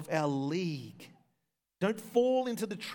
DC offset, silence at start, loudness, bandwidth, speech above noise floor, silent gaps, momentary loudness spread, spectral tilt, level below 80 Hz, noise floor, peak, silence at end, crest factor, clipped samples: under 0.1%; 0 s; -32 LUFS; 19 kHz; 51 dB; none; 10 LU; -6 dB/octave; -84 dBFS; -83 dBFS; -16 dBFS; 0 s; 18 dB; under 0.1%